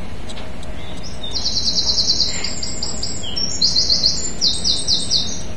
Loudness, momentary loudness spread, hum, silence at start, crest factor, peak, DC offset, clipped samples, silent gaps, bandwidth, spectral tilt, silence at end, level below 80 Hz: -17 LUFS; 18 LU; none; 0 s; 20 dB; 0 dBFS; 9%; under 0.1%; none; 12 kHz; -1.5 dB/octave; 0 s; -36 dBFS